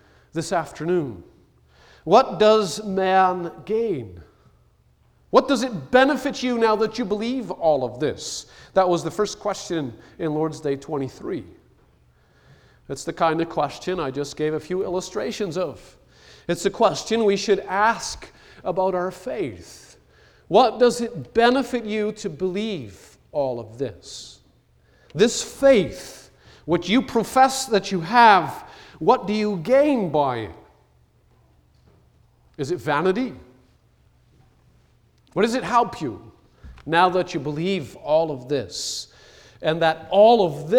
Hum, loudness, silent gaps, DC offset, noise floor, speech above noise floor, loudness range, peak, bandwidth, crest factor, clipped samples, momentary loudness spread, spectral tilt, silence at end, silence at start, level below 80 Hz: none; -22 LUFS; none; under 0.1%; -59 dBFS; 38 dB; 9 LU; -2 dBFS; 19 kHz; 20 dB; under 0.1%; 14 LU; -4.5 dB/octave; 0 s; 0.35 s; -54 dBFS